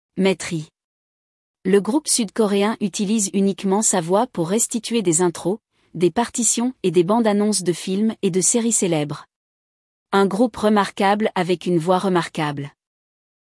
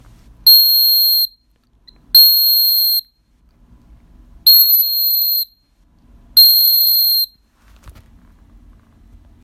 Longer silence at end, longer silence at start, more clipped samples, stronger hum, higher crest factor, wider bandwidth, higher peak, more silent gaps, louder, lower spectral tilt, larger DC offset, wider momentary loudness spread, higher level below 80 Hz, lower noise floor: second, 0.9 s vs 1.55 s; second, 0.15 s vs 0.45 s; neither; neither; about the same, 16 dB vs 16 dB; second, 12 kHz vs 16.5 kHz; second, -4 dBFS vs 0 dBFS; first, 0.84-1.54 s, 9.36-10.06 s vs none; second, -19 LUFS vs -9 LUFS; first, -4 dB/octave vs 1.5 dB/octave; neither; about the same, 8 LU vs 9 LU; second, -62 dBFS vs -50 dBFS; first, under -90 dBFS vs -57 dBFS